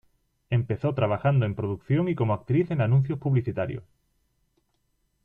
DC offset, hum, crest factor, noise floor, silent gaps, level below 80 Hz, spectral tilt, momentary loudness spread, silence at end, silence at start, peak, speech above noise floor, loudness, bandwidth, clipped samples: under 0.1%; none; 16 dB; -72 dBFS; none; -56 dBFS; -10.5 dB/octave; 8 LU; 1.4 s; 0.5 s; -10 dBFS; 47 dB; -26 LUFS; 3.8 kHz; under 0.1%